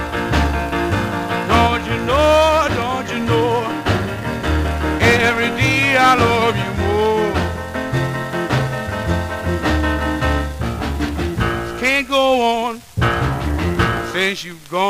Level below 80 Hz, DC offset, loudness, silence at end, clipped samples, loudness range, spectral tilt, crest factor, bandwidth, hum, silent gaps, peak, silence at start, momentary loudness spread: -28 dBFS; 0.2%; -17 LUFS; 0 s; under 0.1%; 5 LU; -5.5 dB/octave; 16 dB; 16 kHz; none; none; 0 dBFS; 0 s; 9 LU